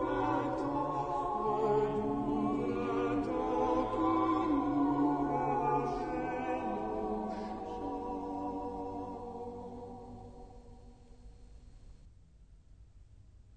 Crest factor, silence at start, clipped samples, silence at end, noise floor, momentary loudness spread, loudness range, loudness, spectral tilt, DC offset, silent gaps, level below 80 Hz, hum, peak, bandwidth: 16 dB; 0 s; under 0.1%; 0 s; -59 dBFS; 14 LU; 16 LU; -34 LUFS; -8 dB/octave; under 0.1%; none; -54 dBFS; none; -20 dBFS; 9 kHz